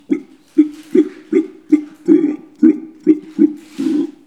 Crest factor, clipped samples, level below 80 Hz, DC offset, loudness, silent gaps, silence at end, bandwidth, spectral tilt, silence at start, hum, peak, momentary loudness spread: 16 dB; under 0.1%; -70 dBFS; 0.1%; -16 LUFS; none; 0.15 s; 8 kHz; -7.5 dB/octave; 0.1 s; none; 0 dBFS; 6 LU